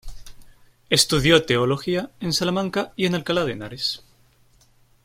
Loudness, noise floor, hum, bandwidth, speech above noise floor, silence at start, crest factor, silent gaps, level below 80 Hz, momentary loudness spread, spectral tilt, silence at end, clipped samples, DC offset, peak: -21 LUFS; -57 dBFS; none; 16.5 kHz; 36 dB; 0.05 s; 20 dB; none; -44 dBFS; 9 LU; -4 dB/octave; 1.05 s; under 0.1%; under 0.1%; -2 dBFS